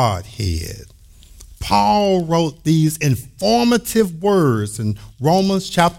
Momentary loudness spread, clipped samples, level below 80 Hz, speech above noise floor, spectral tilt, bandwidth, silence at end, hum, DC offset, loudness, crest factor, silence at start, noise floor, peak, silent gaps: 9 LU; under 0.1%; -40 dBFS; 26 dB; -5.5 dB/octave; 16.5 kHz; 0 s; none; under 0.1%; -17 LUFS; 16 dB; 0 s; -43 dBFS; -2 dBFS; none